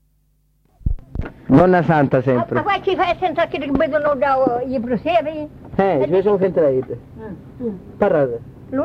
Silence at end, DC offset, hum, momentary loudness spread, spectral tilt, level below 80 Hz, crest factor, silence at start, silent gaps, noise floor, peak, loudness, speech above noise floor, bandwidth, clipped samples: 0 s; under 0.1%; none; 16 LU; -9 dB/octave; -36 dBFS; 18 dB; 0.85 s; none; -60 dBFS; 0 dBFS; -18 LUFS; 43 dB; 6.8 kHz; under 0.1%